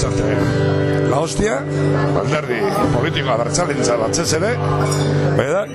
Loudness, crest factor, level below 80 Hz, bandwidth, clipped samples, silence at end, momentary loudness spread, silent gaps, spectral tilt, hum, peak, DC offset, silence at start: -17 LUFS; 14 dB; -38 dBFS; 13.5 kHz; under 0.1%; 0 s; 2 LU; none; -5.5 dB/octave; none; -4 dBFS; under 0.1%; 0 s